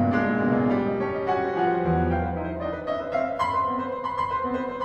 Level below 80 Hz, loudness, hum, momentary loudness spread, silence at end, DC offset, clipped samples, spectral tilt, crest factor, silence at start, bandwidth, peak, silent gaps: -44 dBFS; -25 LUFS; none; 6 LU; 0 s; under 0.1%; under 0.1%; -8.5 dB/octave; 14 dB; 0 s; 8.4 kHz; -12 dBFS; none